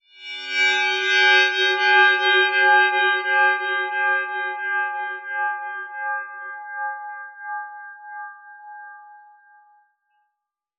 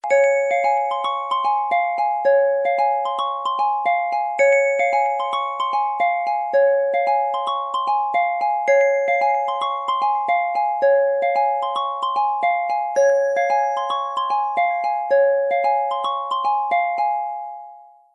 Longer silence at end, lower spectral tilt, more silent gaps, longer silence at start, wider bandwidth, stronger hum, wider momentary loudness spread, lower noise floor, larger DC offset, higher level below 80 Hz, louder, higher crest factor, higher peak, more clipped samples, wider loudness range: first, 1.6 s vs 0.3 s; second, 7.5 dB/octave vs -1 dB/octave; neither; first, 0.2 s vs 0.05 s; about the same, 8 kHz vs 8 kHz; neither; first, 21 LU vs 6 LU; first, -81 dBFS vs -44 dBFS; neither; second, under -90 dBFS vs -74 dBFS; about the same, -18 LUFS vs -20 LUFS; first, 18 dB vs 12 dB; about the same, -4 dBFS vs -6 dBFS; neither; first, 19 LU vs 1 LU